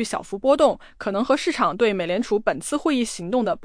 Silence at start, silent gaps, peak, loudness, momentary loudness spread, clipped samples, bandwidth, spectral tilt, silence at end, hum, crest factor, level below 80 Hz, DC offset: 0 s; none; -6 dBFS; -22 LUFS; 7 LU; under 0.1%; 10.5 kHz; -4.5 dB/octave; 0 s; none; 16 dB; -52 dBFS; under 0.1%